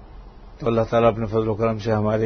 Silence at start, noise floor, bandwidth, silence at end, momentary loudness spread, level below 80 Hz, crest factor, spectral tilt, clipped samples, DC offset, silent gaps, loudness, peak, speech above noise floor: 0 s; -41 dBFS; 6.6 kHz; 0 s; 5 LU; -42 dBFS; 16 dB; -8 dB/octave; under 0.1%; under 0.1%; none; -21 LUFS; -6 dBFS; 21 dB